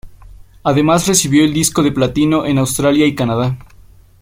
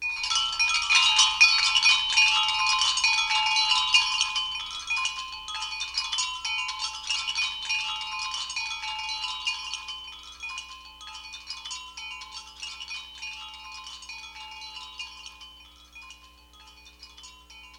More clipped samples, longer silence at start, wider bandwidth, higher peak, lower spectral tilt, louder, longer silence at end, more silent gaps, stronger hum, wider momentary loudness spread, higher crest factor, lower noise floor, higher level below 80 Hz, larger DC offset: neither; about the same, 0.05 s vs 0 s; about the same, 16.5 kHz vs 16.5 kHz; first, 0 dBFS vs -4 dBFS; first, -4.5 dB/octave vs 3.5 dB/octave; first, -14 LUFS vs -23 LUFS; first, 0.6 s vs 0 s; neither; second, none vs 60 Hz at -60 dBFS; second, 7 LU vs 21 LU; second, 14 dB vs 24 dB; second, -42 dBFS vs -53 dBFS; first, -40 dBFS vs -58 dBFS; neither